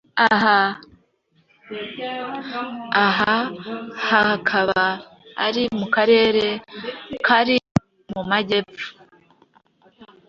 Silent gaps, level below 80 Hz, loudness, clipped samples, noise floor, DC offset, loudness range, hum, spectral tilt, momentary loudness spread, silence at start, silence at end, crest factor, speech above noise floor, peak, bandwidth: 7.71-7.75 s; -56 dBFS; -20 LUFS; under 0.1%; -63 dBFS; under 0.1%; 3 LU; none; -5.5 dB/octave; 17 LU; 0.15 s; 0.25 s; 20 dB; 43 dB; -2 dBFS; 7.6 kHz